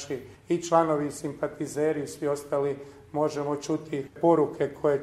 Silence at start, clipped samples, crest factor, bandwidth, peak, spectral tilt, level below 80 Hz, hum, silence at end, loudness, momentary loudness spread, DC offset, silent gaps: 0 s; under 0.1%; 20 dB; 14.5 kHz; -8 dBFS; -6 dB/octave; -64 dBFS; none; 0 s; -28 LUFS; 11 LU; under 0.1%; none